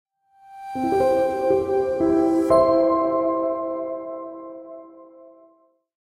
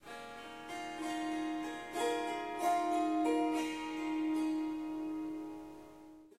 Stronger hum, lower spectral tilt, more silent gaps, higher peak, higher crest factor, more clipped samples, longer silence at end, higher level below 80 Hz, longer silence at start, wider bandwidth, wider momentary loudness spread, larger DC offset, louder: neither; first, -7 dB/octave vs -3.5 dB/octave; neither; first, -6 dBFS vs -22 dBFS; about the same, 18 dB vs 16 dB; neither; first, 0.95 s vs 0.05 s; first, -54 dBFS vs -72 dBFS; first, 0.5 s vs 0.05 s; second, 12 kHz vs 15 kHz; first, 21 LU vs 15 LU; neither; first, -21 LUFS vs -37 LUFS